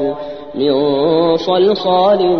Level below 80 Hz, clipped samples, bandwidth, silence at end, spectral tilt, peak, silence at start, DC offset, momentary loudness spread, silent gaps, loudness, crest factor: -52 dBFS; under 0.1%; 6.4 kHz; 0 s; -7.5 dB/octave; -2 dBFS; 0 s; 0.5%; 9 LU; none; -14 LUFS; 12 dB